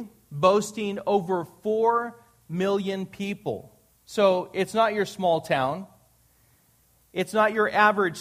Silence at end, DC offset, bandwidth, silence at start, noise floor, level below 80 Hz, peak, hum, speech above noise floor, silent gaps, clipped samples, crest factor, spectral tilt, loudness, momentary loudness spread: 0 s; under 0.1%; 15.5 kHz; 0 s; -62 dBFS; -66 dBFS; -6 dBFS; none; 38 dB; none; under 0.1%; 20 dB; -5 dB/octave; -25 LUFS; 13 LU